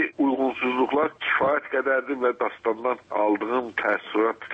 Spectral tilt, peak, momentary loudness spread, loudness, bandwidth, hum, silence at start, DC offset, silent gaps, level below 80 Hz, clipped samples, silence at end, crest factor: -6.5 dB/octave; -10 dBFS; 4 LU; -24 LUFS; 7.4 kHz; none; 0 s; under 0.1%; none; -68 dBFS; under 0.1%; 0 s; 14 dB